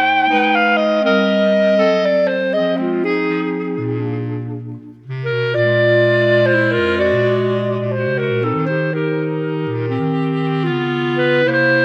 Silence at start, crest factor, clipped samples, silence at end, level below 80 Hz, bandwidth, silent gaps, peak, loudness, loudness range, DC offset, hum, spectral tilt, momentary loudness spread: 0 s; 14 dB; under 0.1%; 0 s; -58 dBFS; 7.8 kHz; none; -4 dBFS; -16 LUFS; 4 LU; under 0.1%; none; -8 dB/octave; 8 LU